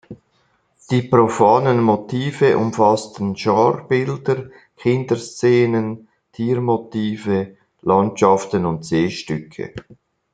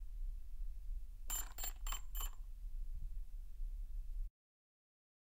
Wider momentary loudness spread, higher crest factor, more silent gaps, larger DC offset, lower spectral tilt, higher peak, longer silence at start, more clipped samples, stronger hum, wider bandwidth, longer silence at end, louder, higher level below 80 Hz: about the same, 12 LU vs 10 LU; about the same, 18 dB vs 16 dB; neither; neither; first, -6.5 dB/octave vs -1.5 dB/octave; first, -2 dBFS vs -28 dBFS; about the same, 0.1 s vs 0 s; neither; neither; second, 9.4 kHz vs 16 kHz; second, 0.4 s vs 1 s; first, -18 LUFS vs -49 LUFS; second, -58 dBFS vs -46 dBFS